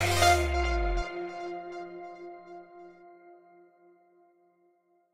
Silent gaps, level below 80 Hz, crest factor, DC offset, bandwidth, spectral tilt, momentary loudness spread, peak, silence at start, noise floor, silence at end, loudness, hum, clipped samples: none; -38 dBFS; 22 dB; under 0.1%; 16 kHz; -4 dB/octave; 26 LU; -10 dBFS; 0 s; -68 dBFS; 1.75 s; -29 LUFS; none; under 0.1%